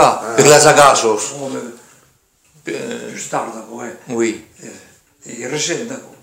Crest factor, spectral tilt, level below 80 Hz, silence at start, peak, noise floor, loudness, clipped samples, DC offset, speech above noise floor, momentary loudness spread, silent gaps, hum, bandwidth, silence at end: 16 dB; -3 dB/octave; -56 dBFS; 0 s; 0 dBFS; -56 dBFS; -14 LUFS; 0.2%; under 0.1%; 40 dB; 22 LU; none; none; 16.5 kHz; 0.2 s